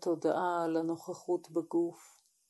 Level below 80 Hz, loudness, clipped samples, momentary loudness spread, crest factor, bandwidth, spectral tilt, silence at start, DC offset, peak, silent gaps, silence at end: under -90 dBFS; -34 LUFS; under 0.1%; 6 LU; 16 dB; 12.5 kHz; -6 dB/octave; 0 s; under 0.1%; -18 dBFS; none; 0.45 s